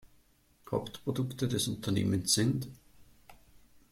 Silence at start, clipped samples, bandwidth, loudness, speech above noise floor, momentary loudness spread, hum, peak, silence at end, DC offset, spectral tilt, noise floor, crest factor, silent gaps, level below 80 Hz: 0.05 s; under 0.1%; 16.5 kHz; -32 LUFS; 34 dB; 9 LU; none; -14 dBFS; 0.55 s; under 0.1%; -4.5 dB/octave; -66 dBFS; 22 dB; none; -62 dBFS